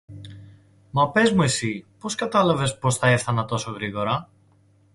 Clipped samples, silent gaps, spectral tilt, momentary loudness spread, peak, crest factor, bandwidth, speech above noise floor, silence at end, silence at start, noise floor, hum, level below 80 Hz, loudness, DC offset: under 0.1%; none; -5 dB/octave; 12 LU; -6 dBFS; 18 dB; 11.5 kHz; 36 dB; 0.7 s; 0.1 s; -58 dBFS; none; -54 dBFS; -22 LUFS; under 0.1%